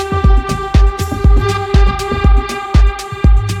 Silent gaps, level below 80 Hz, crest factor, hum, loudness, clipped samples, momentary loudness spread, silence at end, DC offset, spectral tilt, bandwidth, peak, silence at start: none; -12 dBFS; 10 dB; none; -14 LUFS; under 0.1%; 3 LU; 0 s; under 0.1%; -6.5 dB/octave; 13 kHz; 0 dBFS; 0 s